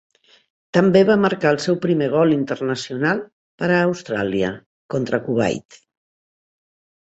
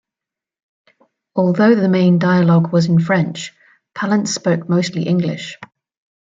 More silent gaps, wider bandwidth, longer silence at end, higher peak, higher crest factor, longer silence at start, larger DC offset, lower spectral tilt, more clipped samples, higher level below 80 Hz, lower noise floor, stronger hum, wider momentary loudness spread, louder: first, 3.32-3.58 s, 4.66-4.89 s vs none; about the same, 8.2 kHz vs 7.8 kHz; first, 1.6 s vs 0.65 s; about the same, -2 dBFS vs -2 dBFS; about the same, 18 dB vs 14 dB; second, 0.75 s vs 1.35 s; neither; about the same, -6.5 dB/octave vs -6.5 dB/octave; neither; about the same, -58 dBFS vs -60 dBFS; about the same, under -90 dBFS vs -87 dBFS; neither; second, 11 LU vs 16 LU; second, -19 LUFS vs -16 LUFS